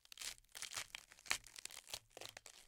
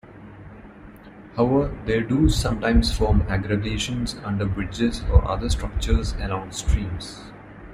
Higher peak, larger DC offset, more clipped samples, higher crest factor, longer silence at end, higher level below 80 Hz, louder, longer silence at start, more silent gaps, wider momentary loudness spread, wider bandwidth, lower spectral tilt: second, -18 dBFS vs -2 dBFS; neither; neither; first, 34 dB vs 20 dB; about the same, 0 s vs 0 s; second, -74 dBFS vs -28 dBFS; second, -48 LUFS vs -23 LUFS; about the same, 0.15 s vs 0.05 s; neither; second, 10 LU vs 22 LU; first, 17 kHz vs 15 kHz; second, 1 dB/octave vs -6 dB/octave